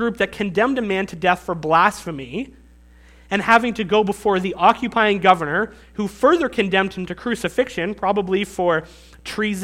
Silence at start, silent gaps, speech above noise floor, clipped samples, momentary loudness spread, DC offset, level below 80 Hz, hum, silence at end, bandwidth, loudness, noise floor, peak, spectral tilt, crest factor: 0 s; none; 28 dB; under 0.1%; 12 LU; under 0.1%; -48 dBFS; none; 0 s; 16 kHz; -19 LUFS; -48 dBFS; 0 dBFS; -5 dB/octave; 20 dB